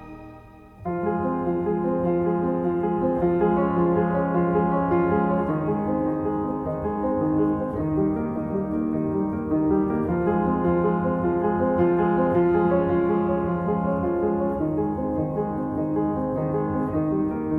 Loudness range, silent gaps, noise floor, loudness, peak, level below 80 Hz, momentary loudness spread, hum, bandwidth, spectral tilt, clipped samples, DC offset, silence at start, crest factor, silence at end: 3 LU; none; -45 dBFS; -24 LUFS; -10 dBFS; -46 dBFS; 5 LU; none; 3.6 kHz; -11.5 dB/octave; under 0.1%; under 0.1%; 0 s; 14 dB; 0 s